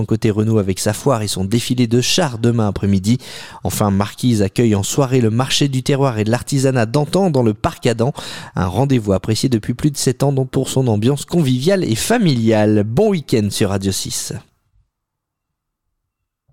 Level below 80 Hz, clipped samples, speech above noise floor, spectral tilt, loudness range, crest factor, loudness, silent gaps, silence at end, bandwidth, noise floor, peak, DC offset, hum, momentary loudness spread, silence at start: -44 dBFS; under 0.1%; 62 dB; -5.5 dB/octave; 2 LU; 14 dB; -17 LUFS; none; 2.1 s; 16.5 kHz; -78 dBFS; -2 dBFS; 0.7%; none; 5 LU; 0 s